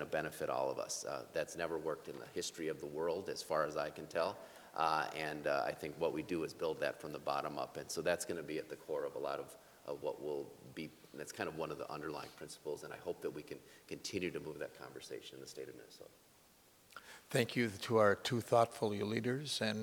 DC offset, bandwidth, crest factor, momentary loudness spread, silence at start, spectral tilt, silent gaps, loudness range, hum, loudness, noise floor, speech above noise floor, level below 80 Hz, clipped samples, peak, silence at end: under 0.1%; over 20 kHz; 24 dB; 15 LU; 0 s; -4.5 dB/octave; none; 9 LU; none; -40 LUFS; -67 dBFS; 27 dB; -74 dBFS; under 0.1%; -16 dBFS; 0 s